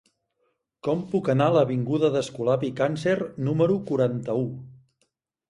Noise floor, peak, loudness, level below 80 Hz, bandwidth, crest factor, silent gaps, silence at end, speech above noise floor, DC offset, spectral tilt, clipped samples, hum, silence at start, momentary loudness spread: -74 dBFS; -8 dBFS; -25 LUFS; -62 dBFS; 11.5 kHz; 18 dB; none; 0.75 s; 50 dB; under 0.1%; -7.5 dB/octave; under 0.1%; none; 0.85 s; 8 LU